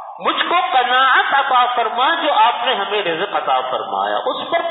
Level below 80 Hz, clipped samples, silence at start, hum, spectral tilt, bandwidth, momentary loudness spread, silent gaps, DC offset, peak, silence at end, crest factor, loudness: -76 dBFS; under 0.1%; 0 s; none; -7 dB/octave; 4.1 kHz; 7 LU; none; under 0.1%; -2 dBFS; 0 s; 16 dB; -16 LUFS